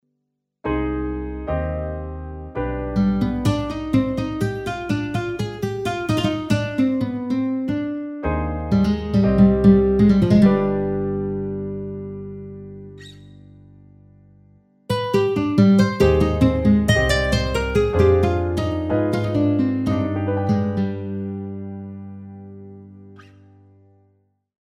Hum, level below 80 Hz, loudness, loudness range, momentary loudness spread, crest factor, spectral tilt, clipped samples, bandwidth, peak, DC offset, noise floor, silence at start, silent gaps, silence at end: 50 Hz at -50 dBFS; -34 dBFS; -20 LUFS; 13 LU; 18 LU; 18 dB; -7.5 dB/octave; under 0.1%; 13 kHz; -2 dBFS; under 0.1%; -76 dBFS; 0.65 s; none; 1.45 s